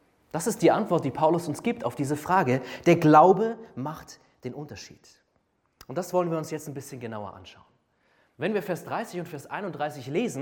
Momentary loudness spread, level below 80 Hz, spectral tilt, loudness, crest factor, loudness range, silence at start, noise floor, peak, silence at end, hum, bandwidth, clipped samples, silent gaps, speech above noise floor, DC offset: 18 LU; -66 dBFS; -6 dB/octave; -25 LUFS; 20 dB; 12 LU; 0.35 s; -71 dBFS; -6 dBFS; 0 s; none; 17.5 kHz; under 0.1%; none; 45 dB; under 0.1%